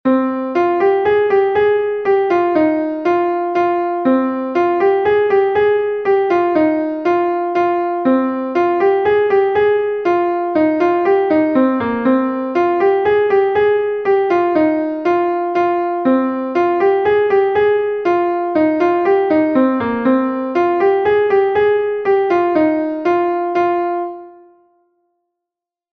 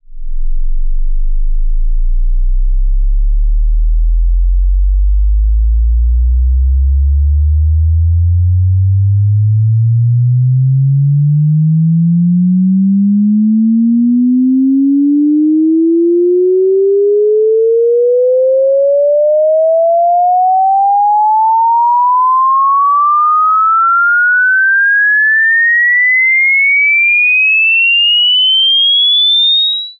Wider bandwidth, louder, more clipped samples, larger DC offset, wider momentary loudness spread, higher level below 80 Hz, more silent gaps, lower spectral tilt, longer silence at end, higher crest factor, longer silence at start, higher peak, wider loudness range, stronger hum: first, 6.2 kHz vs 4.2 kHz; second, -15 LUFS vs -9 LUFS; neither; neither; second, 3 LU vs 10 LU; second, -54 dBFS vs -16 dBFS; neither; first, -7.5 dB/octave vs -3.5 dB/octave; first, 1.6 s vs 0.05 s; first, 12 dB vs 4 dB; about the same, 0.05 s vs 0.1 s; first, -2 dBFS vs -6 dBFS; second, 1 LU vs 9 LU; neither